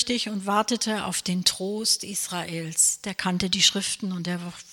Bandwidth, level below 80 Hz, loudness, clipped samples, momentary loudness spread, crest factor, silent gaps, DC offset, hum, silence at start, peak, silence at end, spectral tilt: 17 kHz; -60 dBFS; -24 LUFS; under 0.1%; 10 LU; 20 dB; none; under 0.1%; none; 0 s; -6 dBFS; 0 s; -2.5 dB/octave